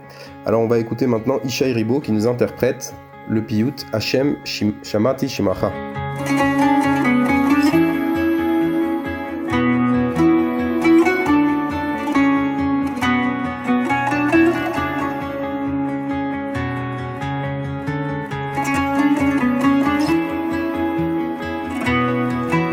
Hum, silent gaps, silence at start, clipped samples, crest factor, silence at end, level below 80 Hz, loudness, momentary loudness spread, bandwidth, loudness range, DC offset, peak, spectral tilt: none; none; 0 s; under 0.1%; 16 dB; 0 s; -50 dBFS; -19 LUFS; 9 LU; 19.5 kHz; 4 LU; under 0.1%; -2 dBFS; -6 dB/octave